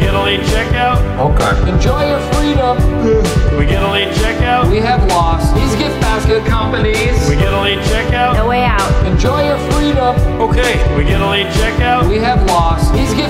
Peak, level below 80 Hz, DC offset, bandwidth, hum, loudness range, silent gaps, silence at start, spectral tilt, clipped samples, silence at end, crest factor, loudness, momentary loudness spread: 0 dBFS; -16 dBFS; under 0.1%; 15.5 kHz; none; 0 LU; none; 0 s; -5.5 dB/octave; under 0.1%; 0 s; 10 dB; -13 LUFS; 2 LU